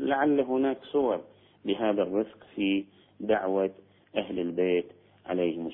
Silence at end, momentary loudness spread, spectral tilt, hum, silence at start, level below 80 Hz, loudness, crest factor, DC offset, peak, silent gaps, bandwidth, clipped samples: 0 s; 11 LU; -9.5 dB/octave; none; 0 s; -66 dBFS; -29 LUFS; 16 dB; under 0.1%; -12 dBFS; none; 3.9 kHz; under 0.1%